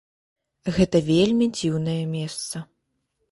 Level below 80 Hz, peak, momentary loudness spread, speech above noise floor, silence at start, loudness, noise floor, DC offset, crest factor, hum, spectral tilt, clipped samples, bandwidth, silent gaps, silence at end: -50 dBFS; -6 dBFS; 13 LU; 53 dB; 0.65 s; -23 LUFS; -75 dBFS; under 0.1%; 18 dB; none; -6 dB/octave; under 0.1%; 11.5 kHz; none; 0.65 s